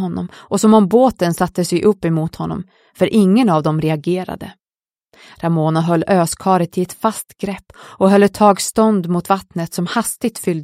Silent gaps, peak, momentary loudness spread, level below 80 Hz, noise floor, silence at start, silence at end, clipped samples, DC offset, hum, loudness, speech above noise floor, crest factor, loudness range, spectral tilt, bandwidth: none; 0 dBFS; 13 LU; -50 dBFS; under -90 dBFS; 0 s; 0 s; under 0.1%; under 0.1%; none; -16 LUFS; over 74 dB; 16 dB; 3 LU; -6 dB/octave; 16 kHz